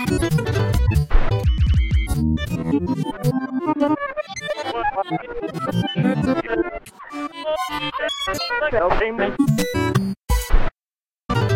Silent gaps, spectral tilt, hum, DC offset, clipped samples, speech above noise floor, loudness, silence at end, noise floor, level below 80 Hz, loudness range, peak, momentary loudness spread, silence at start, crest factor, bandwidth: 10.85-10.89 s; -6 dB/octave; none; under 0.1%; under 0.1%; over 70 dB; -22 LUFS; 0 s; under -90 dBFS; -26 dBFS; 3 LU; -2 dBFS; 8 LU; 0 s; 18 dB; 16.5 kHz